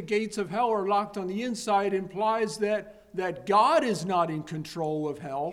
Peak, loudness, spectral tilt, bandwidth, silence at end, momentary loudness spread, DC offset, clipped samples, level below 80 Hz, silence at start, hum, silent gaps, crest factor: -10 dBFS; -28 LUFS; -5 dB/octave; 15 kHz; 0 s; 10 LU; under 0.1%; under 0.1%; -64 dBFS; 0 s; none; none; 18 dB